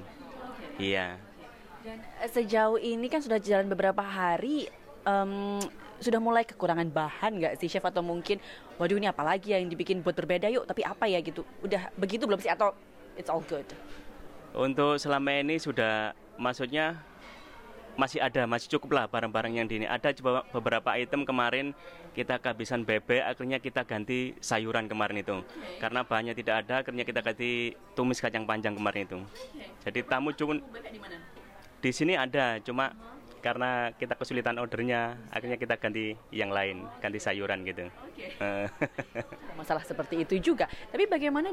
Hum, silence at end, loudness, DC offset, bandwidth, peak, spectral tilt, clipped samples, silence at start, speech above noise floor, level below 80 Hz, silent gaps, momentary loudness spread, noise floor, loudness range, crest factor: none; 0 s; -31 LUFS; under 0.1%; 16 kHz; -12 dBFS; -5 dB/octave; under 0.1%; 0 s; 20 dB; -60 dBFS; none; 16 LU; -51 dBFS; 3 LU; 20 dB